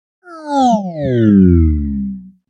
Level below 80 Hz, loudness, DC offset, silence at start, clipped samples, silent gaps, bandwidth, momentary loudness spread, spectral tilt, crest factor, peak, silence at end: -24 dBFS; -13 LUFS; under 0.1%; 0.3 s; under 0.1%; none; 8.4 kHz; 14 LU; -8.5 dB/octave; 14 dB; 0 dBFS; 0.2 s